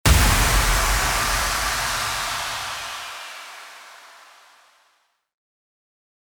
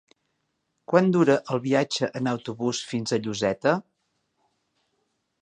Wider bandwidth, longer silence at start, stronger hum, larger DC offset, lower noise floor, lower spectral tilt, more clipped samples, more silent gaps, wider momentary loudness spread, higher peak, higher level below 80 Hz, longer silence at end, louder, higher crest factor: first, over 20 kHz vs 10 kHz; second, 0.05 s vs 0.9 s; neither; neither; second, -66 dBFS vs -76 dBFS; second, -2.5 dB/octave vs -5.5 dB/octave; neither; neither; first, 21 LU vs 8 LU; about the same, -4 dBFS vs -4 dBFS; first, -28 dBFS vs -68 dBFS; first, 2.3 s vs 1.6 s; first, -21 LUFS vs -24 LUFS; about the same, 20 dB vs 24 dB